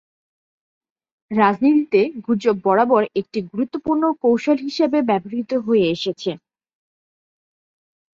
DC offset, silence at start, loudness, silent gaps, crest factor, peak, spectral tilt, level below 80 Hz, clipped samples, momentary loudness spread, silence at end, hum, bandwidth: under 0.1%; 1.3 s; -19 LUFS; none; 18 dB; -4 dBFS; -6.5 dB/octave; -62 dBFS; under 0.1%; 9 LU; 1.8 s; none; 7.4 kHz